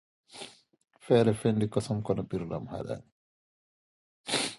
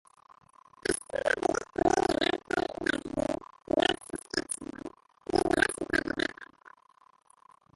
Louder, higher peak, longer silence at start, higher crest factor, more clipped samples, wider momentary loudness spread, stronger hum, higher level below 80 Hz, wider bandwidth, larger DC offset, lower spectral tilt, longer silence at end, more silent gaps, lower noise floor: about the same, -30 LUFS vs -30 LUFS; about the same, -10 dBFS vs -8 dBFS; second, 0.35 s vs 0.9 s; about the same, 22 dB vs 24 dB; neither; first, 20 LU vs 13 LU; neither; about the same, -60 dBFS vs -56 dBFS; about the same, 11.5 kHz vs 12 kHz; neither; first, -5.5 dB/octave vs -3 dB/octave; second, 0 s vs 1.3 s; first, 3.12-4.24 s vs none; second, -49 dBFS vs -63 dBFS